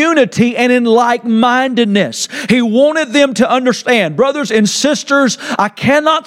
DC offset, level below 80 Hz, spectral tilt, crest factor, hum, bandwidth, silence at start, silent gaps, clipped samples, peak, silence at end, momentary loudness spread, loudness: under 0.1%; -56 dBFS; -4 dB/octave; 12 dB; none; 14.5 kHz; 0 s; none; under 0.1%; 0 dBFS; 0.05 s; 4 LU; -12 LUFS